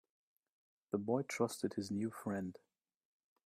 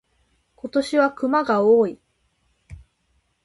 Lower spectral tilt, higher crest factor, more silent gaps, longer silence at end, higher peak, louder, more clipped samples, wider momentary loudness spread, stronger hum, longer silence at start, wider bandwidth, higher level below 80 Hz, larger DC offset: about the same, -5.5 dB/octave vs -6 dB/octave; about the same, 20 dB vs 16 dB; neither; first, 0.95 s vs 0.65 s; second, -22 dBFS vs -6 dBFS; second, -40 LUFS vs -20 LUFS; neither; second, 6 LU vs 9 LU; neither; first, 0.95 s vs 0.65 s; first, 15.5 kHz vs 11.5 kHz; second, -80 dBFS vs -56 dBFS; neither